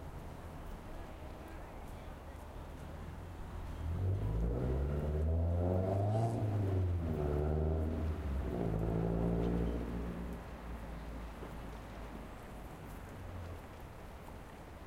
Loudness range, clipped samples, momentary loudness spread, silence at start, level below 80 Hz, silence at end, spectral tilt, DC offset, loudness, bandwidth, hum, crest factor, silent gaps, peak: 13 LU; under 0.1%; 15 LU; 0 s; -44 dBFS; 0 s; -8.5 dB/octave; under 0.1%; -39 LUFS; 15.5 kHz; none; 16 dB; none; -22 dBFS